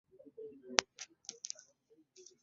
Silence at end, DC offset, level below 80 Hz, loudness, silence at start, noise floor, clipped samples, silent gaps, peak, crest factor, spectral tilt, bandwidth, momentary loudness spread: 0.2 s; under 0.1%; -86 dBFS; -38 LUFS; 0.2 s; -71 dBFS; under 0.1%; none; -2 dBFS; 42 dB; 2 dB/octave; 7.6 kHz; 25 LU